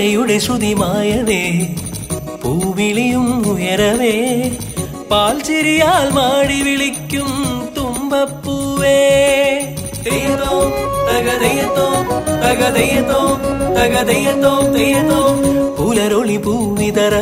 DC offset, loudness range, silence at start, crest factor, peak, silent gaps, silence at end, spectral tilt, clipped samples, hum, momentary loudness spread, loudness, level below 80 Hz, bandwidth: under 0.1%; 3 LU; 0 s; 14 dB; 0 dBFS; none; 0 s; -4.5 dB/octave; under 0.1%; none; 8 LU; -15 LUFS; -36 dBFS; 16.5 kHz